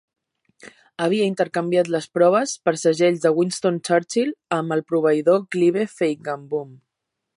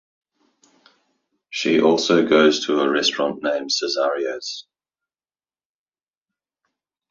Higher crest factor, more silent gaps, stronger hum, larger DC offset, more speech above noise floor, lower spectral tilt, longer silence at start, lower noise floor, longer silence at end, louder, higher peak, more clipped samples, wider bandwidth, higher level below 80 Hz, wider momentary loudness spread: about the same, 16 dB vs 20 dB; neither; neither; neither; second, 61 dB vs over 71 dB; first, -5 dB/octave vs -3.5 dB/octave; second, 0.65 s vs 1.5 s; second, -81 dBFS vs under -90 dBFS; second, 0.6 s vs 2.5 s; about the same, -21 LUFS vs -19 LUFS; about the same, -4 dBFS vs -2 dBFS; neither; first, 11.5 kHz vs 7.6 kHz; second, -74 dBFS vs -66 dBFS; second, 9 LU vs 13 LU